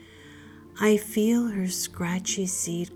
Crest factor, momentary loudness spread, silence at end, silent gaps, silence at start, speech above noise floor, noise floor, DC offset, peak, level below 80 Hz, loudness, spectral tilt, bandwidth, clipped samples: 16 dB; 5 LU; 0 s; none; 0 s; 22 dB; -48 dBFS; under 0.1%; -10 dBFS; -62 dBFS; -26 LUFS; -4 dB/octave; over 20 kHz; under 0.1%